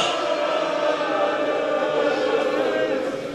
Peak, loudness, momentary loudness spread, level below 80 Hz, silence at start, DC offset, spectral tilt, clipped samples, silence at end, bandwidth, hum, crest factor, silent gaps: -10 dBFS; -22 LUFS; 1 LU; -64 dBFS; 0 s; under 0.1%; -3.5 dB/octave; under 0.1%; 0 s; 12.5 kHz; none; 12 dB; none